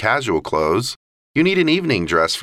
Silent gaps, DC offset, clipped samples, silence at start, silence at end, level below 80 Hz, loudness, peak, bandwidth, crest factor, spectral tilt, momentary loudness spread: 0.96-1.34 s; under 0.1%; under 0.1%; 0 s; 0 s; -46 dBFS; -18 LUFS; -2 dBFS; 15 kHz; 16 dB; -5 dB/octave; 8 LU